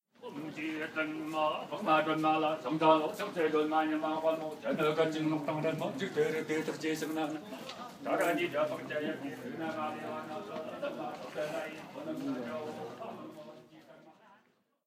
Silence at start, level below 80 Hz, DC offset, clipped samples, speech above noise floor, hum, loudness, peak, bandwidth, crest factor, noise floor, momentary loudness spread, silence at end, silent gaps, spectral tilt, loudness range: 0.2 s; -82 dBFS; under 0.1%; under 0.1%; 37 dB; none; -34 LUFS; -12 dBFS; 16 kHz; 22 dB; -71 dBFS; 13 LU; 0.55 s; none; -5.5 dB/octave; 10 LU